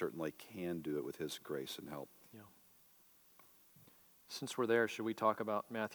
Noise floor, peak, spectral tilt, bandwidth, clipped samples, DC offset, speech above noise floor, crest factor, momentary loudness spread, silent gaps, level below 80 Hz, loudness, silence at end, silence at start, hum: -67 dBFS; -20 dBFS; -4.5 dB/octave; over 20 kHz; under 0.1%; under 0.1%; 27 dB; 22 dB; 20 LU; none; -84 dBFS; -40 LUFS; 0 s; 0 s; none